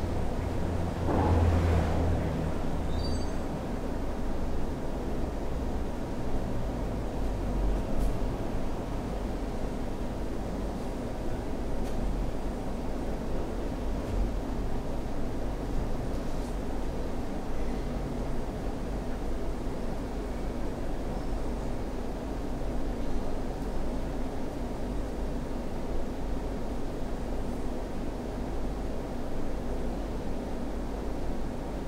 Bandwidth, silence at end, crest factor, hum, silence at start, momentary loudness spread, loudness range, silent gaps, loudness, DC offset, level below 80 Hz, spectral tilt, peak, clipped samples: 14.5 kHz; 0 s; 16 dB; none; 0 s; 4 LU; 5 LU; none; -34 LUFS; under 0.1%; -34 dBFS; -7 dB/octave; -14 dBFS; under 0.1%